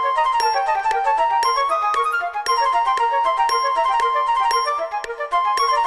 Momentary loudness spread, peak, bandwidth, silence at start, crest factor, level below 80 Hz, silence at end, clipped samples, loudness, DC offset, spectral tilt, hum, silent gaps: 4 LU; -6 dBFS; 13 kHz; 0 s; 12 dB; -52 dBFS; 0 s; under 0.1%; -19 LUFS; under 0.1%; 0.5 dB/octave; none; none